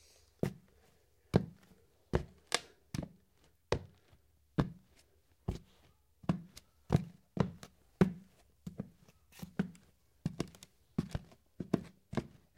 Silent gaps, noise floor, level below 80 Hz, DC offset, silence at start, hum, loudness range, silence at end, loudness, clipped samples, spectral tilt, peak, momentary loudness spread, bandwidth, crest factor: none; -71 dBFS; -56 dBFS; under 0.1%; 0.45 s; none; 5 LU; 0.3 s; -40 LUFS; under 0.1%; -6 dB/octave; -6 dBFS; 18 LU; 16.5 kHz; 34 dB